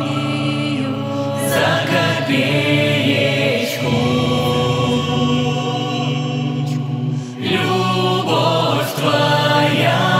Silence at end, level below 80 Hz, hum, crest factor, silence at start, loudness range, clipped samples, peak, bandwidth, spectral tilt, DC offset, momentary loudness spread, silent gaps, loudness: 0 s; -60 dBFS; none; 14 dB; 0 s; 3 LU; under 0.1%; -4 dBFS; 16 kHz; -5.5 dB/octave; under 0.1%; 6 LU; none; -17 LUFS